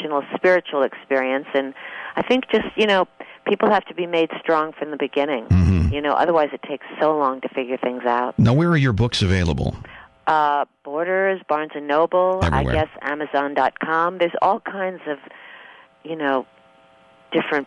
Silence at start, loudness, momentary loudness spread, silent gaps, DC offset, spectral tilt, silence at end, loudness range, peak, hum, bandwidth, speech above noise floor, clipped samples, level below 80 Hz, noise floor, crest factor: 0 s; -21 LUFS; 10 LU; none; under 0.1%; -7 dB/octave; 0 s; 3 LU; -6 dBFS; none; 11 kHz; 32 dB; under 0.1%; -36 dBFS; -52 dBFS; 14 dB